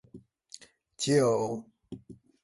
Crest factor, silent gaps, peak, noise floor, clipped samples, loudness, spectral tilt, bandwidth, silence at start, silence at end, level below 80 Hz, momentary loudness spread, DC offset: 20 dB; none; -12 dBFS; -54 dBFS; under 0.1%; -28 LUFS; -5 dB/octave; 11.5 kHz; 0.15 s; 0.3 s; -68 dBFS; 24 LU; under 0.1%